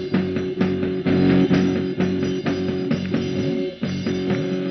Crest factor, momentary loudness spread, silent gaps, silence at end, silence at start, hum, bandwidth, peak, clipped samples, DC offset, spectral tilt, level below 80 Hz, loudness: 14 dB; 7 LU; none; 0 s; 0 s; none; 6.2 kHz; -6 dBFS; under 0.1%; under 0.1%; -6.5 dB/octave; -50 dBFS; -22 LUFS